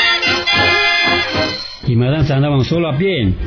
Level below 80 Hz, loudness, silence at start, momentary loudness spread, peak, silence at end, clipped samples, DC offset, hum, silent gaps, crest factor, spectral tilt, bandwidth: -34 dBFS; -14 LUFS; 0 s; 7 LU; -2 dBFS; 0 s; under 0.1%; under 0.1%; none; none; 12 dB; -5.5 dB/octave; 5.4 kHz